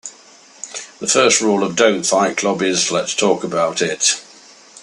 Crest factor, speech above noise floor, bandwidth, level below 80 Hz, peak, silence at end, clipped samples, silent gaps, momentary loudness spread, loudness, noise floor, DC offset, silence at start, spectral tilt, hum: 18 dB; 29 dB; 12.5 kHz; -64 dBFS; 0 dBFS; 0.05 s; under 0.1%; none; 16 LU; -16 LUFS; -45 dBFS; under 0.1%; 0.05 s; -2 dB/octave; none